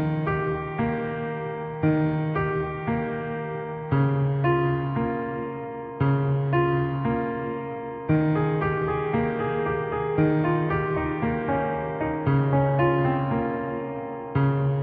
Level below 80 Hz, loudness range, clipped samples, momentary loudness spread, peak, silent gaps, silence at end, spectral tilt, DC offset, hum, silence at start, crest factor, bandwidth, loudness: -46 dBFS; 2 LU; under 0.1%; 9 LU; -10 dBFS; none; 0 s; -12 dB/octave; under 0.1%; none; 0 s; 16 dB; 3.9 kHz; -25 LUFS